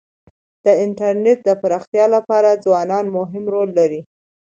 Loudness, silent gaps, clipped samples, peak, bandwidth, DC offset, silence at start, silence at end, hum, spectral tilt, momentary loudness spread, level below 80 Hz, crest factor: -16 LUFS; 1.87-1.93 s; under 0.1%; 0 dBFS; 7.6 kHz; under 0.1%; 0.65 s; 0.45 s; none; -6.5 dB/octave; 7 LU; -66 dBFS; 16 dB